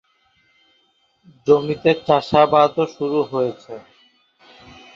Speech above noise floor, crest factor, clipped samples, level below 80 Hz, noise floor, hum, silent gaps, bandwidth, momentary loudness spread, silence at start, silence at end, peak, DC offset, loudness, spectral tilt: 45 dB; 20 dB; under 0.1%; -56 dBFS; -63 dBFS; none; none; 7.4 kHz; 17 LU; 1.45 s; 1.15 s; 0 dBFS; under 0.1%; -18 LUFS; -7 dB/octave